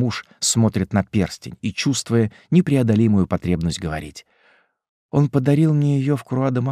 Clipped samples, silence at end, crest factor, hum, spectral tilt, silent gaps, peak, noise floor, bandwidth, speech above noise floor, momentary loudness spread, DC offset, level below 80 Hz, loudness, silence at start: under 0.1%; 0 s; 16 dB; none; -6 dB/octave; 4.89-5.09 s; -4 dBFS; -59 dBFS; 14.5 kHz; 40 dB; 10 LU; under 0.1%; -46 dBFS; -20 LUFS; 0 s